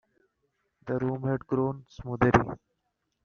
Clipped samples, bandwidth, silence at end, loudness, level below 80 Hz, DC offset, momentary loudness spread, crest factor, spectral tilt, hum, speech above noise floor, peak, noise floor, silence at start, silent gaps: under 0.1%; 7 kHz; 0.7 s; -28 LUFS; -50 dBFS; under 0.1%; 17 LU; 26 dB; -7 dB/octave; none; 52 dB; -4 dBFS; -79 dBFS; 0.85 s; none